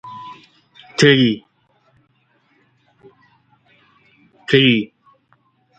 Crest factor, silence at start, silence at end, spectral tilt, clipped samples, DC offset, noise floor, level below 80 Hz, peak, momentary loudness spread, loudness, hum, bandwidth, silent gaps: 20 dB; 0.05 s; 0.95 s; -5 dB/octave; under 0.1%; under 0.1%; -61 dBFS; -60 dBFS; 0 dBFS; 24 LU; -15 LUFS; none; 9.2 kHz; none